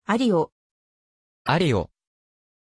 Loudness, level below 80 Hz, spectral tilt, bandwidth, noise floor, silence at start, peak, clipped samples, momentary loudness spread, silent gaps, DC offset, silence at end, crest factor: -23 LUFS; -52 dBFS; -6.5 dB/octave; 11 kHz; under -90 dBFS; 0.1 s; -8 dBFS; under 0.1%; 11 LU; 0.52-1.45 s; under 0.1%; 0.95 s; 18 dB